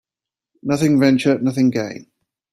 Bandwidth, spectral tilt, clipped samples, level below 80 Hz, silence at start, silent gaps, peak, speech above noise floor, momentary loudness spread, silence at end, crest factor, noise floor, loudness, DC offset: 14 kHz; -6.5 dB/octave; under 0.1%; -58 dBFS; 0.65 s; none; -2 dBFS; 72 dB; 15 LU; 0.5 s; 16 dB; -88 dBFS; -17 LUFS; under 0.1%